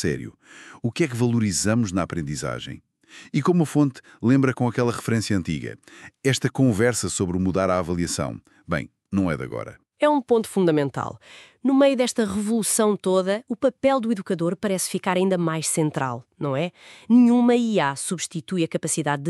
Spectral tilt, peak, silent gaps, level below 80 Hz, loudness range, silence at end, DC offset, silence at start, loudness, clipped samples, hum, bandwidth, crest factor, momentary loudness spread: -5.5 dB/octave; -6 dBFS; none; -54 dBFS; 3 LU; 0 s; under 0.1%; 0 s; -23 LUFS; under 0.1%; none; 13.5 kHz; 16 dB; 11 LU